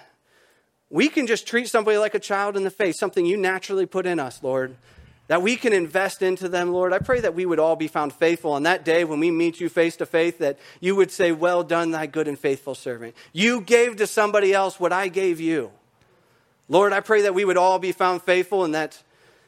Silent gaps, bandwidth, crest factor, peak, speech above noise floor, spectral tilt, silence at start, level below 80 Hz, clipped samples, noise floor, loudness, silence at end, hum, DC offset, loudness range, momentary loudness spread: none; 15.5 kHz; 20 dB; -2 dBFS; 41 dB; -4.5 dB/octave; 0.9 s; -62 dBFS; under 0.1%; -62 dBFS; -22 LUFS; 0.5 s; none; under 0.1%; 2 LU; 8 LU